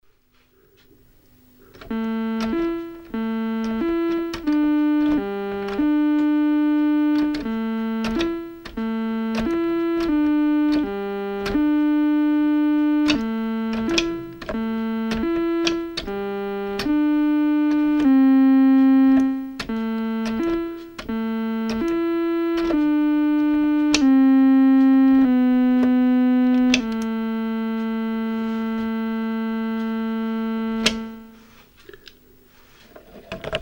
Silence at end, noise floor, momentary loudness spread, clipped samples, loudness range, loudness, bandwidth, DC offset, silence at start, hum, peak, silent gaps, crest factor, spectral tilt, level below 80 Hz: 0 s; -59 dBFS; 12 LU; under 0.1%; 9 LU; -20 LUFS; 16.5 kHz; under 0.1%; 1.8 s; none; 0 dBFS; none; 20 dB; -5 dB/octave; -48 dBFS